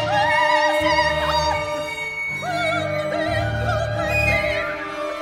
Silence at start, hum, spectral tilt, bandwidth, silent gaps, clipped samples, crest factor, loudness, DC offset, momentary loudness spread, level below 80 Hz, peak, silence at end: 0 s; none; -4.5 dB/octave; 16.5 kHz; none; under 0.1%; 16 dB; -20 LUFS; under 0.1%; 8 LU; -38 dBFS; -6 dBFS; 0 s